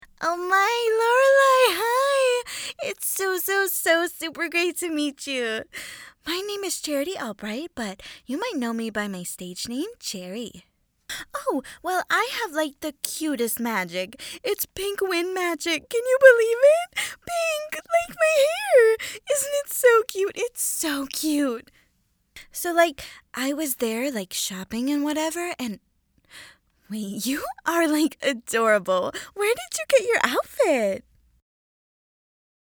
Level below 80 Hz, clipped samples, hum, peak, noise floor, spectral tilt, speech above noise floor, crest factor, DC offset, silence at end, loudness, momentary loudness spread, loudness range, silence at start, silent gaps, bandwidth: -62 dBFS; under 0.1%; none; 0 dBFS; -68 dBFS; -2.5 dB/octave; 44 dB; 24 dB; under 0.1%; 1.7 s; -23 LUFS; 14 LU; 9 LU; 0.2 s; none; over 20 kHz